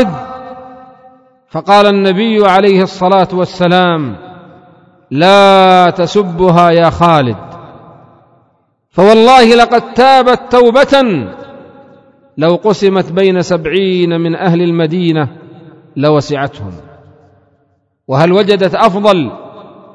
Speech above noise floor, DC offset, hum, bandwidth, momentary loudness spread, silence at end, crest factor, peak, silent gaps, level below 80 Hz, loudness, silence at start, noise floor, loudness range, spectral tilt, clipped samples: 49 dB; under 0.1%; none; 11 kHz; 16 LU; 0.3 s; 10 dB; 0 dBFS; none; -44 dBFS; -9 LUFS; 0 s; -57 dBFS; 6 LU; -6.5 dB/octave; 2%